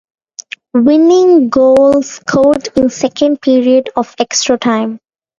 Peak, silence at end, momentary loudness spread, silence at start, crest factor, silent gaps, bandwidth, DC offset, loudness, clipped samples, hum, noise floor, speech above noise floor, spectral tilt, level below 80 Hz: 0 dBFS; 0.4 s; 10 LU; 0.4 s; 10 dB; none; 9.6 kHz; under 0.1%; -11 LUFS; under 0.1%; none; -31 dBFS; 22 dB; -4 dB/octave; -48 dBFS